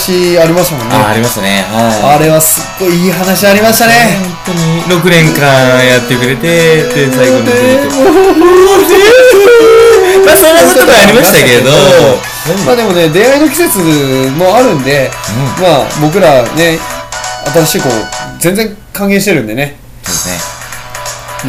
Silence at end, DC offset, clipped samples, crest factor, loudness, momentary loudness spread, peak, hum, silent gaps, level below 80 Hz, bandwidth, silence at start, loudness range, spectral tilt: 0 s; under 0.1%; 6%; 6 dB; -6 LUFS; 12 LU; 0 dBFS; none; none; -34 dBFS; over 20 kHz; 0 s; 8 LU; -4 dB/octave